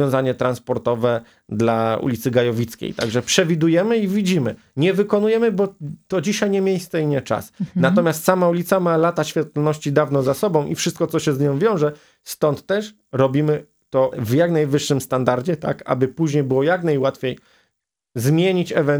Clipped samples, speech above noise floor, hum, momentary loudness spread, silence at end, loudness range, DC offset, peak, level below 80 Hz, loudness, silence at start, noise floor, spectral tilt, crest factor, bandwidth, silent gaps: under 0.1%; 55 dB; none; 8 LU; 0 s; 2 LU; under 0.1%; 0 dBFS; -58 dBFS; -20 LUFS; 0 s; -74 dBFS; -6 dB/octave; 20 dB; over 20 kHz; none